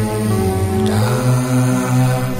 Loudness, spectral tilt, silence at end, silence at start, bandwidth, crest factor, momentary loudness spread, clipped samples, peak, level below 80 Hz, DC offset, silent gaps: -16 LUFS; -6.5 dB/octave; 0 s; 0 s; 16.5 kHz; 12 dB; 2 LU; under 0.1%; -4 dBFS; -36 dBFS; under 0.1%; none